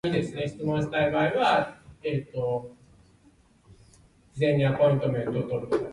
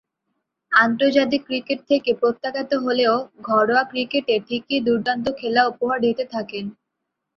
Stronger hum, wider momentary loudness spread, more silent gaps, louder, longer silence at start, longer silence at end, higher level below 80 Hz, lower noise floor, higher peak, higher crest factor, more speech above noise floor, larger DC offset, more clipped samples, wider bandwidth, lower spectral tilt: neither; about the same, 11 LU vs 9 LU; neither; second, -26 LUFS vs -21 LUFS; second, 0.05 s vs 0.7 s; second, 0 s vs 0.65 s; first, -56 dBFS vs -64 dBFS; second, -60 dBFS vs -80 dBFS; second, -10 dBFS vs -2 dBFS; about the same, 16 dB vs 20 dB; second, 34 dB vs 59 dB; neither; neither; first, 11 kHz vs 6.8 kHz; first, -7.5 dB/octave vs -5.5 dB/octave